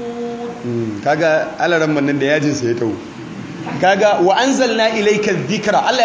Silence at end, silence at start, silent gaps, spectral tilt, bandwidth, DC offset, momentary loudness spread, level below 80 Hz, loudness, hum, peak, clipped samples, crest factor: 0 s; 0 s; none; -4.5 dB/octave; 8 kHz; under 0.1%; 13 LU; -56 dBFS; -16 LUFS; none; -2 dBFS; under 0.1%; 14 dB